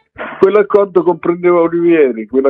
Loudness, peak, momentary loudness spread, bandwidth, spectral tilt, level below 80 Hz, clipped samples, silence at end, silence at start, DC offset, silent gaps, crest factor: -12 LUFS; 0 dBFS; 4 LU; 4.4 kHz; -9 dB/octave; -56 dBFS; 0.2%; 0 s; 0.2 s; under 0.1%; none; 12 dB